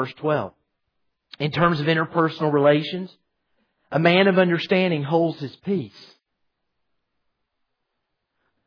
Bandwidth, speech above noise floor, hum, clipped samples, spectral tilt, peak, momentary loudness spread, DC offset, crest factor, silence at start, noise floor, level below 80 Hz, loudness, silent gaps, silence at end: 5.4 kHz; 57 dB; none; under 0.1%; -8 dB/octave; -4 dBFS; 14 LU; under 0.1%; 18 dB; 0 s; -78 dBFS; -64 dBFS; -21 LUFS; none; 2.8 s